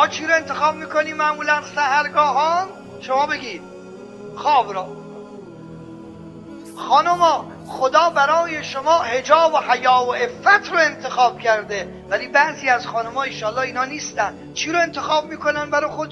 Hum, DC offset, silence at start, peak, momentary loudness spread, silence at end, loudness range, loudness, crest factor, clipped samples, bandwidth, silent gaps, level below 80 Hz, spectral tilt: none; under 0.1%; 0 s; 0 dBFS; 22 LU; 0 s; 7 LU; -19 LUFS; 20 dB; under 0.1%; 12 kHz; none; -60 dBFS; -3 dB/octave